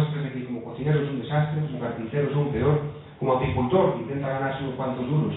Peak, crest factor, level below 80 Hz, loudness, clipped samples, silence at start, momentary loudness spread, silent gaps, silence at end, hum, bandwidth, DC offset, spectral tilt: -8 dBFS; 16 dB; -50 dBFS; -26 LUFS; under 0.1%; 0 s; 8 LU; none; 0 s; none; 4 kHz; under 0.1%; -12 dB/octave